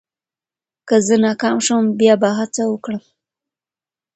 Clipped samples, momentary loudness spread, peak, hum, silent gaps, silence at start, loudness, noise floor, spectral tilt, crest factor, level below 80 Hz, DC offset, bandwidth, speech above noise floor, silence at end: under 0.1%; 10 LU; -2 dBFS; none; none; 0.85 s; -16 LUFS; under -90 dBFS; -4.5 dB/octave; 18 dB; -64 dBFS; under 0.1%; 8.8 kHz; over 74 dB; 1.15 s